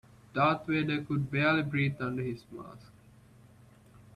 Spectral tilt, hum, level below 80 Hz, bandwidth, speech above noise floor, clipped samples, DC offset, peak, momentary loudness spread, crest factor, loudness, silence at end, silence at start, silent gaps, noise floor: -8 dB/octave; none; -64 dBFS; 11 kHz; 27 dB; under 0.1%; under 0.1%; -14 dBFS; 17 LU; 20 dB; -30 LUFS; 1.3 s; 0.35 s; none; -57 dBFS